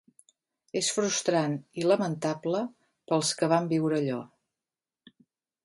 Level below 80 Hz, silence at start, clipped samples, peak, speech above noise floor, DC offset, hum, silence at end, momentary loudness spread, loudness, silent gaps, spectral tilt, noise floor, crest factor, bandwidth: -76 dBFS; 0.75 s; under 0.1%; -10 dBFS; over 63 dB; under 0.1%; none; 1.4 s; 7 LU; -28 LUFS; none; -4.5 dB/octave; under -90 dBFS; 20 dB; 11.5 kHz